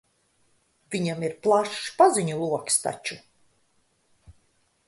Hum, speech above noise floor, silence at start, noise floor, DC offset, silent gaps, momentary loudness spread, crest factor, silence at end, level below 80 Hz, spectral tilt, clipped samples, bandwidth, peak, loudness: none; 44 dB; 0.9 s; -68 dBFS; under 0.1%; none; 14 LU; 22 dB; 0.55 s; -66 dBFS; -4 dB/octave; under 0.1%; 12 kHz; -6 dBFS; -24 LUFS